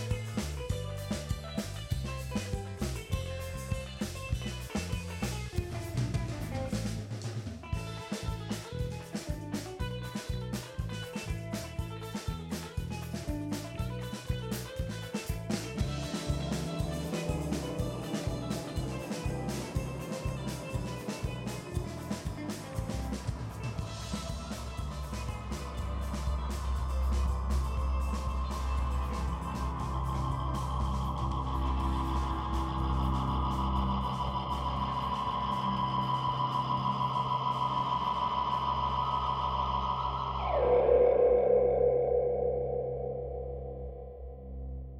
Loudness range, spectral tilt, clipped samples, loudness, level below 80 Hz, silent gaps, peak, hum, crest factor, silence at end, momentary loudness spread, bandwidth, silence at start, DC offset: 10 LU; -6 dB/octave; under 0.1%; -34 LUFS; -40 dBFS; none; -12 dBFS; none; 20 dB; 0 s; 8 LU; 16 kHz; 0 s; under 0.1%